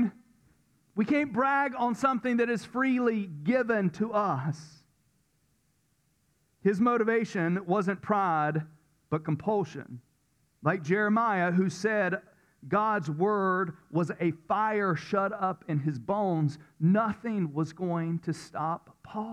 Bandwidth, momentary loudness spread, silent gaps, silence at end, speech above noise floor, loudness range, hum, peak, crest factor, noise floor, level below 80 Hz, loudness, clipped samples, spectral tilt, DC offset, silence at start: 10.5 kHz; 8 LU; none; 0 s; 43 dB; 4 LU; none; -14 dBFS; 16 dB; -72 dBFS; -70 dBFS; -29 LUFS; under 0.1%; -7.5 dB/octave; under 0.1%; 0 s